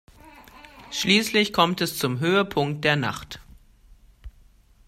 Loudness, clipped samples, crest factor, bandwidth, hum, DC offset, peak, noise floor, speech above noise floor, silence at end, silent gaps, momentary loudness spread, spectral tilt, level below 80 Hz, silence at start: -22 LUFS; under 0.1%; 22 dB; 16 kHz; none; under 0.1%; -2 dBFS; -55 dBFS; 32 dB; 0.6 s; none; 15 LU; -4 dB/octave; -52 dBFS; 0.25 s